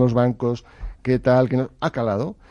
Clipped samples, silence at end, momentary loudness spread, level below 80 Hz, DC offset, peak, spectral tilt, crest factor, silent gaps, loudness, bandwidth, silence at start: under 0.1%; 0.15 s; 12 LU; -42 dBFS; under 0.1%; -6 dBFS; -8.5 dB/octave; 14 dB; none; -22 LUFS; 7 kHz; 0 s